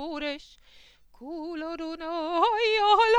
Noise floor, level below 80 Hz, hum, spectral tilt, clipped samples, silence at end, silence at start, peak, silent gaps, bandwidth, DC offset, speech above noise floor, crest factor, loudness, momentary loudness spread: -55 dBFS; -58 dBFS; none; -2 dB/octave; under 0.1%; 0 s; 0 s; -10 dBFS; none; 10.5 kHz; under 0.1%; 30 dB; 16 dB; -27 LUFS; 19 LU